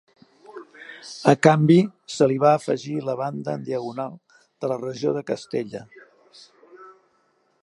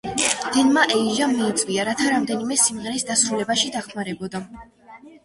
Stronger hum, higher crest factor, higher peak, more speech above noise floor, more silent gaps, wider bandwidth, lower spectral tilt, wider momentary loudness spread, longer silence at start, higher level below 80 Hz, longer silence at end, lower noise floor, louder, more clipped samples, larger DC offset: neither; about the same, 22 dB vs 18 dB; about the same, -2 dBFS vs -4 dBFS; first, 44 dB vs 24 dB; neither; about the same, 11.5 kHz vs 11.5 kHz; first, -6.5 dB/octave vs -2 dB/octave; first, 23 LU vs 12 LU; first, 0.55 s vs 0.05 s; second, -70 dBFS vs -58 dBFS; first, 0.7 s vs 0.15 s; first, -66 dBFS vs -45 dBFS; about the same, -22 LUFS vs -20 LUFS; neither; neither